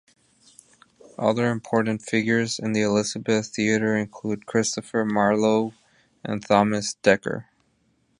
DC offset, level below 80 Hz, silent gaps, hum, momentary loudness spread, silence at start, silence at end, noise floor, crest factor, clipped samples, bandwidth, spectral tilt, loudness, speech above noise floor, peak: under 0.1%; -62 dBFS; none; none; 11 LU; 1.2 s; 0.8 s; -67 dBFS; 22 dB; under 0.1%; 11 kHz; -5 dB/octave; -23 LUFS; 44 dB; -2 dBFS